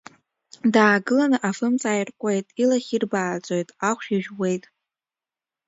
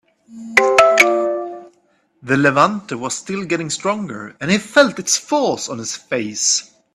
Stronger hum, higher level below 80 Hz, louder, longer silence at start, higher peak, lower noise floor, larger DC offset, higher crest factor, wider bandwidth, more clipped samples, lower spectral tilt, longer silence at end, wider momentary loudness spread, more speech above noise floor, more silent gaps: neither; second, -72 dBFS vs -60 dBFS; second, -22 LUFS vs -17 LUFS; first, 0.65 s vs 0.3 s; about the same, -2 dBFS vs 0 dBFS; first, under -90 dBFS vs -60 dBFS; neither; about the same, 22 dB vs 18 dB; second, 8 kHz vs 15.5 kHz; neither; first, -5 dB/octave vs -3 dB/octave; first, 1.1 s vs 0.3 s; second, 9 LU vs 14 LU; first, over 68 dB vs 41 dB; neither